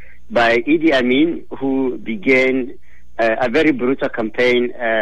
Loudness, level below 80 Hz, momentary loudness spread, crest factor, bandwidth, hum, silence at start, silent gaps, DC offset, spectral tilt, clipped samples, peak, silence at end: -17 LUFS; -48 dBFS; 8 LU; 14 dB; 9.4 kHz; none; 0.3 s; none; 4%; -5.5 dB/octave; under 0.1%; -2 dBFS; 0 s